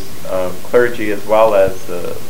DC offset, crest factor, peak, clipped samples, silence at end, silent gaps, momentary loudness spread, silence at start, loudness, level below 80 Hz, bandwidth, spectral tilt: 10%; 16 dB; 0 dBFS; under 0.1%; 0 s; none; 12 LU; 0 s; -15 LUFS; -44 dBFS; 16.5 kHz; -5 dB/octave